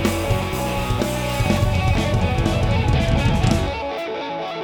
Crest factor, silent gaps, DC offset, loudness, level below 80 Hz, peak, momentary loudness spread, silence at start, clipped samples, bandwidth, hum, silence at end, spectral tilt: 16 dB; none; under 0.1%; -21 LUFS; -28 dBFS; -4 dBFS; 7 LU; 0 s; under 0.1%; over 20 kHz; none; 0 s; -6 dB/octave